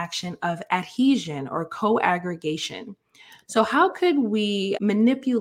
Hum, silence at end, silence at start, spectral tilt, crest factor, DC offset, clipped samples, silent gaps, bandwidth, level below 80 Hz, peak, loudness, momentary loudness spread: none; 0 s; 0 s; -5 dB/octave; 18 dB; under 0.1%; under 0.1%; none; 15 kHz; -68 dBFS; -6 dBFS; -23 LUFS; 9 LU